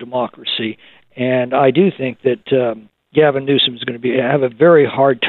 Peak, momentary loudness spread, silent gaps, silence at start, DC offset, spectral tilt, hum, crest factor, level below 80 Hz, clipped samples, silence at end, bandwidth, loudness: 0 dBFS; 11 LU; none; 0 s; under 0.1%; -10 dB/octave; none; 14 dB; -62 dBFS; under 0.1%; 0 s; 4.4 kHz; -15 LUFS